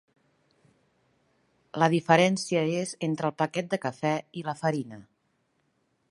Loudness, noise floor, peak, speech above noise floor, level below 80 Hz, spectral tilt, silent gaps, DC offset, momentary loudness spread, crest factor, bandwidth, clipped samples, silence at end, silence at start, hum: -27 LUFS; -73 dBFS; -4 dBFS; 46 dB; -74 dBFS; -5.5 dB/octave; none; under 0.1%; 12 LU; 26 dB; 11.5 kHz; under 0.1%; 1.1 s; 1.75 s; none